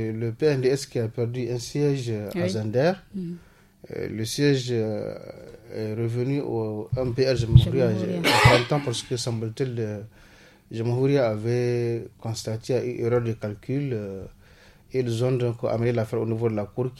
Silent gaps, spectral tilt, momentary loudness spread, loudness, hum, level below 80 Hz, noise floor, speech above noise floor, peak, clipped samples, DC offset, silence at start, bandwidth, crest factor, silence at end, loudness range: none; -6 dB/octave; 13 LU; -25 LUFS; none; -44 dBFS; -52 dBFS; 28 dB; 0 dBFS; under 0.1%; under 0.1%; 0 s; 14.5 kHz; 24 dB; 0 s; 6 LU